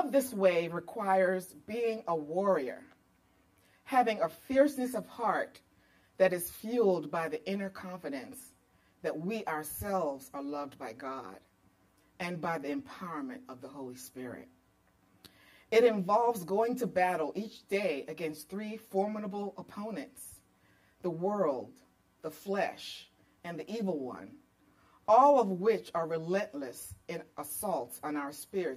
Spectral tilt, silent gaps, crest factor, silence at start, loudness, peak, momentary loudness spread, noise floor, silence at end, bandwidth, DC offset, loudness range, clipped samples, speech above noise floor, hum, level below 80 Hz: -5.5 dB/octave; none; 20 dB; 0 s; -33 LUFS; -12 dBFS; 16 LU; -69 dBFS; 0 s; 15.5 kHz; under 0.1%; 10 LU; under 0.1%; 36 dB; none; -70 dBFS